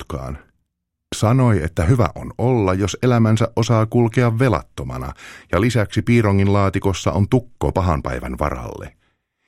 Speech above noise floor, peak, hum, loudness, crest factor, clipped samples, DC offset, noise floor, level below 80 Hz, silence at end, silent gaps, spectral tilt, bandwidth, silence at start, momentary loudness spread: 58 dB; 0 dBFS; none; -18 LUFS; 18 dB; under 0.1%; under 0.1%; -76 dBFS; -36 dBFS; 0.6 s; none; -7 dB/octave; 13 kHz; 0 s; 14 LU